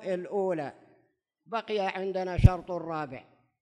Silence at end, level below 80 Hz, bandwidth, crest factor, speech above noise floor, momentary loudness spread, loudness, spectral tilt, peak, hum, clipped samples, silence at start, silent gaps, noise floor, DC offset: 0.4 s; -36 dBFS; 10.5 kHz; 26 dB; 43 dB; 14 LU; -30 LUFS; -8 dB/octave; -4 dBFS; none; under 0.1%; 0 s; none; -71 dBFS; under 0.1%